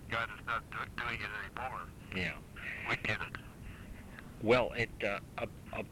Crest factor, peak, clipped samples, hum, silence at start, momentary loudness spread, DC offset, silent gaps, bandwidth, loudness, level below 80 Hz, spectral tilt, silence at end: 22 dB; -16 dBFS; under 0.1%; none; 0 s; 19 LU; under 0.1%; none; 17 kHz; -37 LUFS; -54 dBFS; -5.5 dB/octave; 0 s